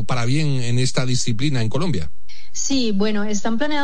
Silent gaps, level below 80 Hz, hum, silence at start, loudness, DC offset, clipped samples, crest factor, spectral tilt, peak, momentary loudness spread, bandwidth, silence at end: none; -46 dBFS; none; 0 s; -22 LUFS; 10%; under 0.1%; 14 dB; -5 dB/octave; -6 dBFS; 5 LU; 10 kHz; 0 s